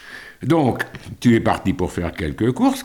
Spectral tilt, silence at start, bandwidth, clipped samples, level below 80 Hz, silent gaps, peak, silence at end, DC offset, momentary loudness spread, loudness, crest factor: -6.5 dB/octave; 0.05 s; 18 kHz; under 0.1%; -42 dBFS; none; -4 dBFS; 0 s; 0.1%; 11 LU; -20 LUFS; 16 dB